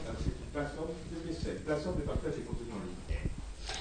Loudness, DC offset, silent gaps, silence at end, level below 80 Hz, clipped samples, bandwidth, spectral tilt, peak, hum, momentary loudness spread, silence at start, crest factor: -39 LUFS; under 0.1%; none; 0 s; -42 dBFS; under 0.1%; 9.6 kHz; -6 dB/octave; -20 dBFS; none; 6 LU; 0 s; 18 dB